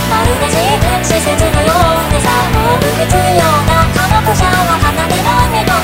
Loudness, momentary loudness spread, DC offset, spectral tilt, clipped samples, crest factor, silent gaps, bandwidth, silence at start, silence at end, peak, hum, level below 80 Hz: -11 LUFS; 2 LU; under 0.1%; -4.5 dB/octave; under 0.1%; 10 dB; none; 16.5 kHz; 0 s; 0 s; 0 dBFS; none; -20 dBFS